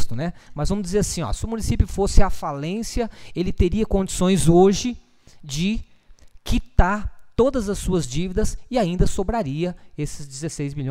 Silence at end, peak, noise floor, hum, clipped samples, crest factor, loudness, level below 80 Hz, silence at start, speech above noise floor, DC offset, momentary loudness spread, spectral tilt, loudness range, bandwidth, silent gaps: 0 s; 0 dBFS; -46 dBFS; none; under 0.1%; 20 dB; -23 LUFS; -26 dBFS; 0 s; 26 dB; under 0.1%; 11 LU; -5.5 dB/octave; 4 LU; 15 kHz; none